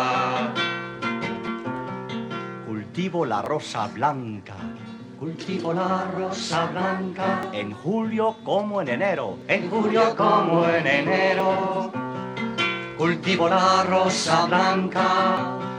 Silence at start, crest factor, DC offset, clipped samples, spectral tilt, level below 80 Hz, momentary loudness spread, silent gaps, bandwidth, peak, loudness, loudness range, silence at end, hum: 0 s; 18 dB; under 0.1%; under 0.1%; -5 dB/octave; -66 dBFS; 12 LU; none; 11 kHz; -4 dBFS; -23 LUFS; 7 LU; 0 s; none